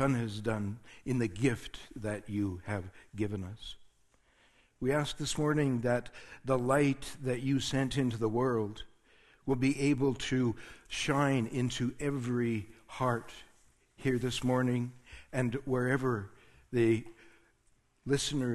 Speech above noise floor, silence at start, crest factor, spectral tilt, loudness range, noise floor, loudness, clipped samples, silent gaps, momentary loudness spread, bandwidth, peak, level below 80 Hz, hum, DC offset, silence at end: 38 dB; 0 s; 20 dB; -6 dB/octave; 5 LU; -70 dBFS; -33 LUFS; under 0.1%; none; 15 LU; 12.5 kHz; -14 dBFS; -56 dBFS; none; under 0.1%; 0 s